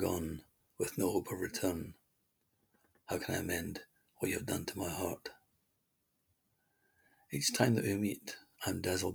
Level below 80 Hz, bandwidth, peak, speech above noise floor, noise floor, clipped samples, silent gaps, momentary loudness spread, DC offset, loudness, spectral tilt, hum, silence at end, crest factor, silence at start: -66 dBFS; over 20 kHz; -14 dBFS; 44 dB; -81 dBFS; under 0.1%; none; 14 LU; under 0.1%; -37 LUFS; -4.5 dB/octave; none; 0 s; 26 dB; 0 s